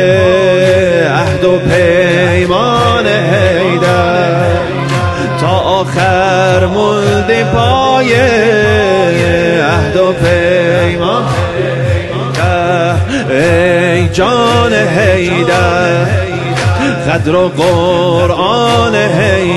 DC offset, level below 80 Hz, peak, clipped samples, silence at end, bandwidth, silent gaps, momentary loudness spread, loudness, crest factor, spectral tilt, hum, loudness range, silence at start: 0.2%; -32 dBFS; 0 dBFS; under 0.1%; 0 s; 12 kHz; none; 5 LU; -10 LUFS; 10 dB; -6 dB/octave; none; 2 LU; 0 s